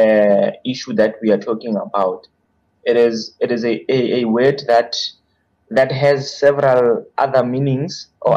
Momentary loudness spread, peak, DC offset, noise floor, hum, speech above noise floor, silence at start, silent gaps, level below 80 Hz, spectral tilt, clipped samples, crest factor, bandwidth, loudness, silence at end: 8 LU; -4 dBFS; under 0.1%; -62 dBFS; none; 46 dB; 0 s; none; -60 dBFS; -6 dB/octave; under 0.1%; 12 dB; 8.2 kHz; -17 LUFS; 0 s